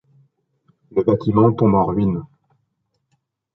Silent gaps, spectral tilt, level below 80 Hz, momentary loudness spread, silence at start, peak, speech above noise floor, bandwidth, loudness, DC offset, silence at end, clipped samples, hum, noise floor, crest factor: none; -12 dB/octave; -46 dBFS; 9 LU; 0.95 s; -2 dBFS; 55 dB; 5.8 kHz; -18 LUFS; under 0.1%; 1.3 s; under 0.1%; none; -72 dBFS; 18 dB